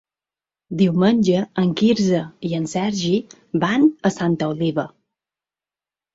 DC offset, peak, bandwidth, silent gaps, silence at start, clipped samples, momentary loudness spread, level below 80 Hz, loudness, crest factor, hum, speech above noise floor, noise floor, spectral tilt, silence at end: under 0.1%; -4 dBFS; 7.8 kHz; none; 0.7 s; under 0.1%; 9 LU; -58 dBFS; -20 LUFS; 16 dB; none; over 71 dB; under -90 dBFS; -6.5 dB/octave; 1.25 s